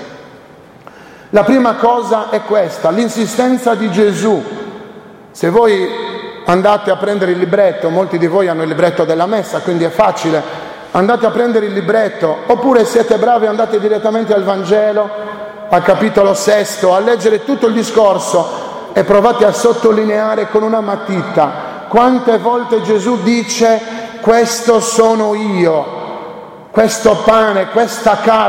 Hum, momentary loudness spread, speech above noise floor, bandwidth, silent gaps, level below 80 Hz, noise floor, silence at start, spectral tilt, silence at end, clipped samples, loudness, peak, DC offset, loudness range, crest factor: none; 8 LU; 27 dB; 16.5 kHz; none; -50 dBFS; -38 dBFS; 0 s; -5 dB/octave; 0 s; under 0.1%; -12 LUFS; 0 dBFS; under 0.1%; 2 LU; 12 dB